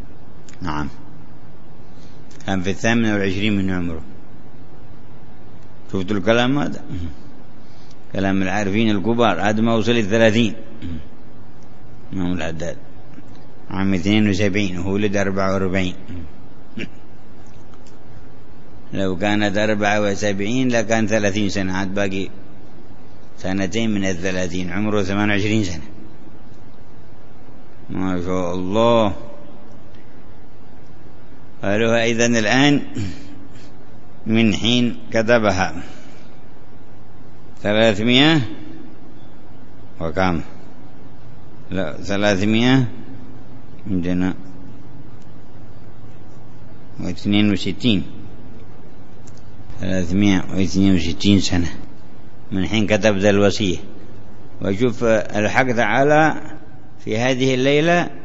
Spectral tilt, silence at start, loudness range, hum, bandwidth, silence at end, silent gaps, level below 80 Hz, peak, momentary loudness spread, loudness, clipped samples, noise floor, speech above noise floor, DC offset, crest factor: -5.5 dB/octave; 0 s; 7 LU; none; 8 kHz; 0 s; none; -46 dBFS; 0 dBFS; 20 LU; -19 LUFS; under 0.1%; -44 dBFS; 26 dB; 8%; 20 dB